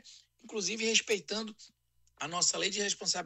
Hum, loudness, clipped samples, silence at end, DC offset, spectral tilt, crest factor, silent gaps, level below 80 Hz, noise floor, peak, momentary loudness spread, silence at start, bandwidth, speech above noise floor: none; -31 LUFS; under 0.1%; 0 s; under 0.1%; -1 dB/octave; 22 dB; none; -76 dBFS; -56 dBFS; -12 dBFS; 13 LU; 0.05 s; 15 kHz; 23 dB